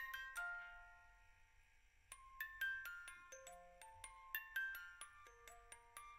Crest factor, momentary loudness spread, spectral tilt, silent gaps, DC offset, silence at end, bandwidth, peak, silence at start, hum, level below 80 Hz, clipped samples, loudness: 24 dB; 17 LU; 0.5 dB/octave; none; under 0.1%; 0 s; 16 kHz; -28 dBFS; 0 s; none; -72 dBFS; under 0.1%; -50 LUFS